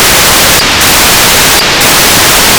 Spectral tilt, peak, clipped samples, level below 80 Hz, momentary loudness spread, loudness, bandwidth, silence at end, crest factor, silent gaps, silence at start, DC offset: -1 dB/octave; 0 dBFS; 20%; -24 dBFS; 1 LU; -2 LUFS; over 20 kHz; 0 s; 4 dB; none; 0 s; under 0.1%